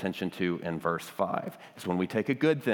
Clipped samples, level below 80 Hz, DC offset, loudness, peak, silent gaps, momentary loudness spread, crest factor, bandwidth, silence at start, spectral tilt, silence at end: under 0.1%; -74 dBFS; under 0.1%; -31 LUFS; -14 dBFS; none; 8 LU; 18 dB; 19 kHz; 0 s; -6.5 dB/octave; 0 s